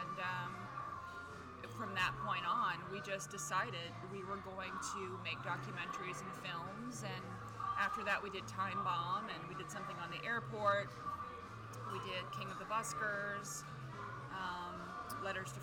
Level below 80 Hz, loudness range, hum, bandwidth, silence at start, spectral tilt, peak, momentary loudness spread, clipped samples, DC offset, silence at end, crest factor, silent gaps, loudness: -68 dBFS; 3 LU; none; 19 kHz; 0 s; -3.5 dB/octave; -22 dBFS; 10 LU; under 0.1%; under 0.1%; 0 s; 20 dB; none; -42 LUFS